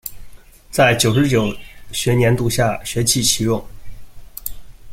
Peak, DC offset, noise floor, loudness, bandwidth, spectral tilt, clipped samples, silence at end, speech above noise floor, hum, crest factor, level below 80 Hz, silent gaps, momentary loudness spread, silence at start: -2 dBFS; under 0.1%; -38 dBFS; -17 LUFS; 16.5 kHz; -4 dB/octave; under 0.1%; 0 s; 22 dB; none; 18 dB; -38 dBFS; none; 16 LU; 0.05 s